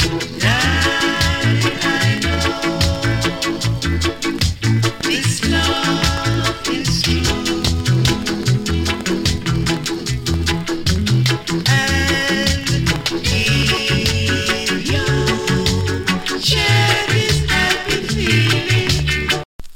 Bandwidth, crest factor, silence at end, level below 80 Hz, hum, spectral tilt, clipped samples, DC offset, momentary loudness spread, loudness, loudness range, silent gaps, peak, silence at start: 17 kHz; 16 dB; 0 s; -28 dBFS; none; -4 dB/octave; under 0.1%; under 0.1%; 4 LU; -17 LUFS; 3 LU; 19.45-19.59 s; -2 dBFS; 0 s